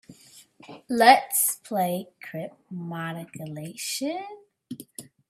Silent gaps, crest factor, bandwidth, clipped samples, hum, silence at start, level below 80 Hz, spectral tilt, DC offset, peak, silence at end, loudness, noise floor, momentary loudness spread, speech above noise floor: none; 26 dB; 16 kHz; under 0.1%; none; 0.1 s; -76 dBFS; -3 dB/octave; under 0.1%; 0 dBFS; 0.3 s; -24 LUFS; -53 dBFS; 23 LU; 28 dB